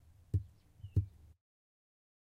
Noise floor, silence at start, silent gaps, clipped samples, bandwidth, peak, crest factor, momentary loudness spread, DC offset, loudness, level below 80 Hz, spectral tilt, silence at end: -55 dBFS; 0.35 s; none; under 0.1%; 3.1 kHz; -20 dBFS; 22 dB; 18 LU; under 0.1%; -40 LUFS; -52 dBFS; -10 dB/octave; 1.25 s